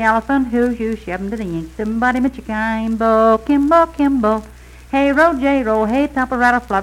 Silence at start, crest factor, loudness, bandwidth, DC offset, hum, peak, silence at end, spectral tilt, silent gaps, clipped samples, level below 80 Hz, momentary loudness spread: 0 s; 14 dB; -16 LUFS; 13.5 kHz; under 0.1%; none; -2 dBFS; 0 s; -6.5 dB/octave; none; under 0.1%; -38 dBFS; 10 LU